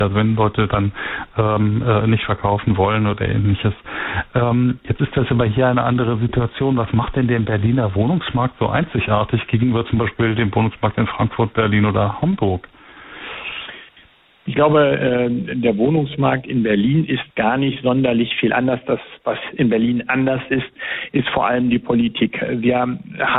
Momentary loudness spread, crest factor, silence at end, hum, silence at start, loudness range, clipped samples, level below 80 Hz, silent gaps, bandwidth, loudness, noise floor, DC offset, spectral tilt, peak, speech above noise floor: 7 LU; 16 dB; 0 s; none; 0 s; 2 LU; under 0.1%; -40 dBFS; none; 4.1 kHz; -18 LUFS; -50 dBFS; under 0.1%; -12 dB/octave; -2 dBFS; 33 dB